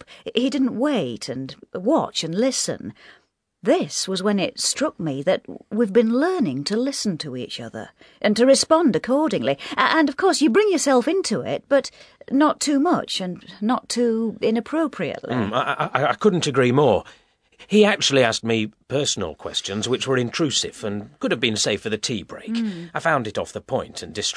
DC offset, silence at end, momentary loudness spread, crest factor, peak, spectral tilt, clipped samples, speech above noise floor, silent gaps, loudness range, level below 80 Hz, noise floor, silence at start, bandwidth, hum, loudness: under 0.1%; 0 s; 11 LU; 22 dB; 0 dBFS; -4 dB/octave; under 0.1%; 31 dB; none; 4 LU; -60 dBFS; -52 dBFS; 0.1 s; 11 kHz; none; -21 LUFS